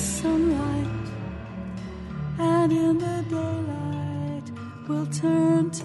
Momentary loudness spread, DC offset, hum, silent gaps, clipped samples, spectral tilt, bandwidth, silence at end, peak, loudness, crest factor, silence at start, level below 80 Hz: 14 LU; under 0.1%; none; none; under 0.1%; -6.5 dB/octave; 11.5 kHz; 0 s; -12 dBFS; -26 LUFS; 14 dB; 0 s; -46 dBFS